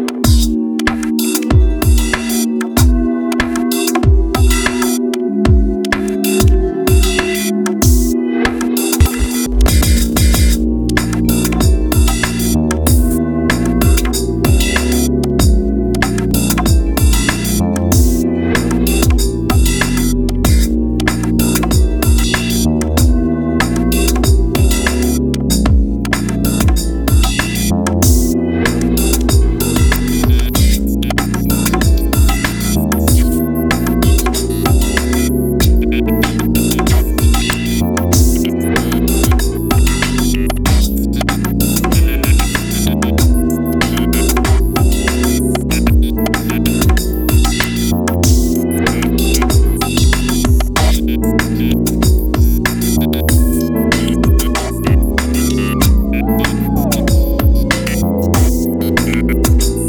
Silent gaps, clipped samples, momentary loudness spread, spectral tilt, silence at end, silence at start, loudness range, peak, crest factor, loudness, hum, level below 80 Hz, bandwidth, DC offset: none; under 0.1%; 3 LU; -5 dB/octave; 0 s; 0 s; 1 LU; 0 dBFS; 12 dB; -14 LUFS; none; -16 dBFS; over 20 kHz; under 0.1%